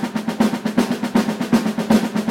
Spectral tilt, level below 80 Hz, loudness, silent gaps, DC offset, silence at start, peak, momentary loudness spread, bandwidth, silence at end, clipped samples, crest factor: -5.5 dB/octave; -50 dBFS; -19 LUFS; none; under 0.1%; 0 s; -2 dBFS; 3 LU; 16.5 kHz; 0 s; under 0.1%; 16 dB